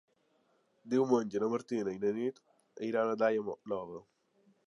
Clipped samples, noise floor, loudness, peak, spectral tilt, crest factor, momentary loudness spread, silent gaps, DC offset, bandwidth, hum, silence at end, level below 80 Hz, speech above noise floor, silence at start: under 0.1%; -73 dBFS; -34 LUFS; -16 dBFS; -6.5 dB/octave; 18 dB; 10 LU; none; under 0.1%; 10.5 kHz; none; 0.65 s; -78 dBFS; 40 dB; 0.85 s